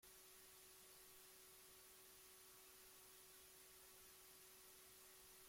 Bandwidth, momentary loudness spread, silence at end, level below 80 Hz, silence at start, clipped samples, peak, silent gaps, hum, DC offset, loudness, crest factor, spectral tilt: 16.5 kHz; 0 LU; 0 s; -86 dBFS; 0 s; under 0.1%; -52 dBFS; none; none; under 0.1%; -63 LUFS; 12 dB; -0.5 dB/octave